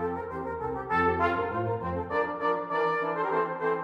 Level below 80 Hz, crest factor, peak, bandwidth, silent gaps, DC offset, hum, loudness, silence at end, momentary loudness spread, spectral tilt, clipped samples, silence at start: -54 dBFS; 14 dB; -14 dBFS; 6.8 kHz; none; under 0.1%; none; -29 LUFS; 0 s; 8 LU; -8 dB/octave; under 0.1%; 0 s